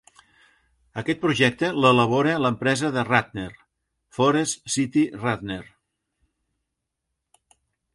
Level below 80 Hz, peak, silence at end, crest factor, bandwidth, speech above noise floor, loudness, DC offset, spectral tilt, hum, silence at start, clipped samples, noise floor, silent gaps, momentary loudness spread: -58 dBFS; -2 dBFS; 2.3 s; 22 dB; 11.5 kHz; 59 dB; -22 LUFS; under 0.1%; -4.5 dB/octave; none; 0.95 s; under 0.1%; -81 dBFS; none; 16 LU